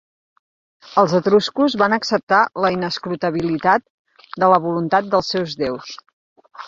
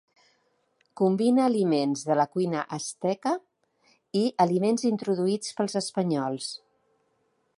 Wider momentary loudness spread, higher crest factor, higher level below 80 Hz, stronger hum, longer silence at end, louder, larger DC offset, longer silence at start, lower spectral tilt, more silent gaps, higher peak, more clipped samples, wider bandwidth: about the same, 9 LU vs 9 LU; about the same, 18 dB vs 20 dB; first, -58 dBFS vs -76 dBFS; neither; second, 0 s vs 1 s; first, -18 LUFS vs -26 LUFS; neither; about the same, 0.85 s vs 0.95 s; about the same, -5.5 dB/octave vs -5.5 dB/octave; first, 2.23-2.27 s, 3.90-4.05 s, 6.13-6.36 s vs none; first, -2 dBFS vs -8 dBFS; neither; second, 7.6 kHz vs 11.5 kHz